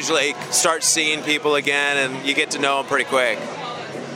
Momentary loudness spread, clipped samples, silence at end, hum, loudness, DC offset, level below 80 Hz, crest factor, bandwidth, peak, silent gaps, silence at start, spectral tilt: 11 LU; under 0.1%; 0 s; none; -19 LUFS; under 0.1%; -78 dBFS; 18 dB; 17 kHz; -2 dBFS; none; 0 s; -1 dB/octave